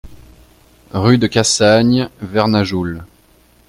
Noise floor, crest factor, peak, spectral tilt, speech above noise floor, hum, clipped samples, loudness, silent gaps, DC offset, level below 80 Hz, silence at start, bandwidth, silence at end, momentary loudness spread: -51 dBFS; 16 dB; 0 dBFS; -5 dB/octave; 37 dB; none; under 0.1%; -14 LUFS; none; under 0.1%; -44 dBFS; 0.05 s; 15 kHz; 0.65 s; 13 LU